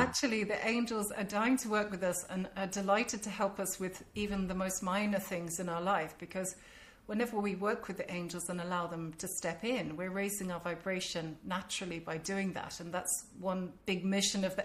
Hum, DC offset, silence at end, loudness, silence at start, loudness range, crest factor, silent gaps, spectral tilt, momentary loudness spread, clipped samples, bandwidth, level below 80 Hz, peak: none; under 0.1%; 0 s; -36 LUFS; 0 s; 4 LU; 20 dB; none; -4 dB/octave; 8 LU; under 0.1%; 15.5 kHz; -62 dBFS; -16 dBFS